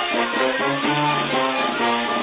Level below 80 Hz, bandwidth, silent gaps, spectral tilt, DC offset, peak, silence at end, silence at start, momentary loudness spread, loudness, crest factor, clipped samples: -60 dBFS; 4 kHz; none; -8.5 dB/octave; under 0.1%; -6 dBFS; 0 s; 0 s; 1 LU; -20 LUFS; 14 dB; under 0.1%